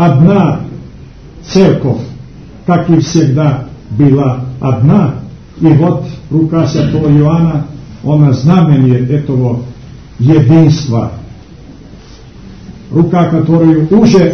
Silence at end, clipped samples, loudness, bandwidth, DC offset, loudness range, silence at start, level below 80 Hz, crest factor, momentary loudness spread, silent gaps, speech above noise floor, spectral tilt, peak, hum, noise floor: 0 s; 1%; -10 LUFS; 6.6 kHz; 0.5%; 3 LU; 0 s; -36 dBFS; 10 dB; 14 LU; none; 25 dB; -8.5 dB/octave; 0 dBFS; none; -33 dBFS